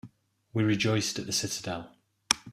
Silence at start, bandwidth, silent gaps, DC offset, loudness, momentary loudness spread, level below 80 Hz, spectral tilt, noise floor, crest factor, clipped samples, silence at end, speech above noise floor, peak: 0.05 s; 15.5 kHz; none; under 0.1%; -29 LUFS; 10 LU; -64 dBFS; -3.5 dB/octave; -56 dBFS; 28 dB; under 0.1%; 0 s; 27 dB; -2 dBFS